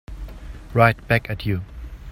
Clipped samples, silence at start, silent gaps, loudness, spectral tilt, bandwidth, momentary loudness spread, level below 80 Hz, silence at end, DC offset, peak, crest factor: under 0.1%; 0.1 s; none; -21 LUFS; -7.5 dB/octave; 16 kHz; 21 LU; -36 dBFS; 0 s; under 0.1%; 0 dBFS; 22 dB